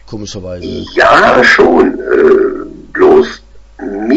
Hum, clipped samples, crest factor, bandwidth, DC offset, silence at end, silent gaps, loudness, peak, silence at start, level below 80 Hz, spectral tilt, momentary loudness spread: none; 0.4%; 10 dB; 8 kHz; under 0.1%; 0 s; none; -8 LUFS; 0 dBFS; 0.1 s; -36 dBFS; -5 dB/octave; 18 LU